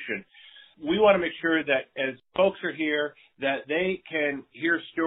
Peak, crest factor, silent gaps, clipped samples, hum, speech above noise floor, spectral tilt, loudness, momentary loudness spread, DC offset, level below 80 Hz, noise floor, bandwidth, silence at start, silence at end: -6 dBFS; 22 dB; none; under 0.1%; none; 26 dB; -2.5 dB/octave; -26 LUFS; 10 LU; under 0.1%; -64 dBFS; -52 dBFS; 4 kHz; 0 s; 0 s